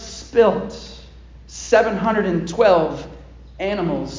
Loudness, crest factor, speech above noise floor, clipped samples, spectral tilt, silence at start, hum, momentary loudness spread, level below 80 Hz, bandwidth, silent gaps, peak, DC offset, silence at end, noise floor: -18 LUFS; 18 dB; 24 dB; under 0.1%; -5.5 dB/octave; 0 s; none; 20 LU; -42 dBFS; 7.6 kHz; none; -2 dBFS; under 0.1%; 0 s; -41 dBFS